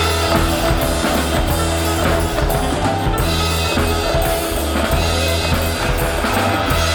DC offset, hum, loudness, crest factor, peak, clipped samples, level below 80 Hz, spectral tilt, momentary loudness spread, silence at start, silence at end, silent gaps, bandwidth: under 0.1%; none; -17 LUFS; 14 dB; -2 dBFS; under 0.1%; -24 dBFS; -4.5 dB/octave; 2 LU; 0 s; 0 s; none; over 20 kHz